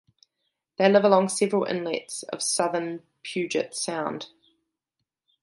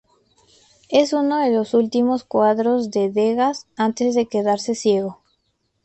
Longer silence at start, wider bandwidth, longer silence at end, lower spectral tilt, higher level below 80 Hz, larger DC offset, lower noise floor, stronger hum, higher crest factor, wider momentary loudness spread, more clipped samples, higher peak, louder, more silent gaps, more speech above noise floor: about the same, 0.8 s vs 0.9 s; first, 11.5 kHz vs 8.6 kHz; first, 1.15 s vs 0.7 s; about the same, -4 dB/octave vs -5 dB/octave; second, -76 dBFS vs -64 dBFS; neither; first, -84 dBFS vs -69 dBFS; neither; first, 22 dB vs 16 dB; first, 16 LU vs 4 LU; neither; about the same, -4 dBFS vs -4 dBFS; second, -25 LUFS vs -19 LUFS; neither; first, 59 dB vs 51 dB